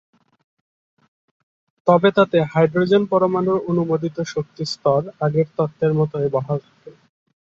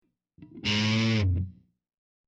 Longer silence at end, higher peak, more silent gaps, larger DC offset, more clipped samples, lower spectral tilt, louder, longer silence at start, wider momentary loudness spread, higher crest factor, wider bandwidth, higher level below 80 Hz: about the same, 0.65 s vs 0.75 s; first, -2 dBFS vs -14 dBFS; neither; neither; neither; first, -7.5 dB/octave vs -5.5 dB/octave; first, -19 LUFS vs -27 LUFS; first, 1.85 s vs 0.4 s; about the same, 10 LU vs 9 LU; about the same, 18 dB vs 16 dB; about the same, 7.8 kHz vs 8 kHz; second, -60 dBFS vs -48 dBFS